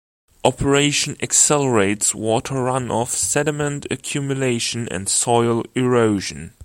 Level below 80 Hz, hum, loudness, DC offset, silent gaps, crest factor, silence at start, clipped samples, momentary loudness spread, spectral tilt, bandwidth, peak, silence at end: -46 dBFS; none; -19 LUFS; under 0.1%; none; 20 dB; 0.45 s; under 0.1%; 9 LU; -3.5 dB/octave; 16.5 kHz; 0 dBFS; 0.15 s